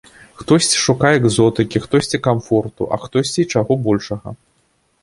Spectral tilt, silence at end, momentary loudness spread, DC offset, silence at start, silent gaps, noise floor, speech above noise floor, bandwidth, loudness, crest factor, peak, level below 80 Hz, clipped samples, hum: -4.5 dB/octave; 0.65 s; 10 LU; under 0.1%; 0.4 s; none; -62 dBFS; 46 dB; 11.5 kHz; -16 LUFS; 16 dB; -2 dBFS; -46 dBFS; under 0.1%; none